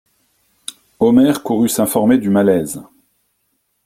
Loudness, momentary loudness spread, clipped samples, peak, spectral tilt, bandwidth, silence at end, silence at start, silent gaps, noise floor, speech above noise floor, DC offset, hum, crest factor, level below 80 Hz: -14 LUFS; 20 LU; under 0.1%; -2 dBFS; -5.5 dB/octave; 16 kHz; 1.05 s; 1 s; none; -67 dBFS; 53 dB; under 0.1%; none; 14 dB; -54 dBFS